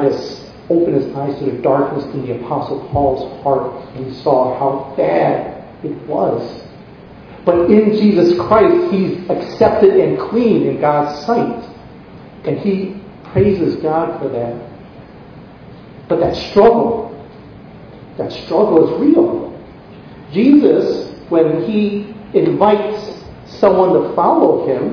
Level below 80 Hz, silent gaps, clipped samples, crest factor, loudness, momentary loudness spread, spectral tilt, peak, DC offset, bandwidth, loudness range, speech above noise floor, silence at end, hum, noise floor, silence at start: -44 dBFS; none; under 0.1%; 16 dB; -15 LUFS; 16 LU; -8.5 dB/octave; 0 dBFS; under 0.1%; 5.4 kHz; 6 LU; 23 dB; 0 s; none; -37 dBFS; 0 s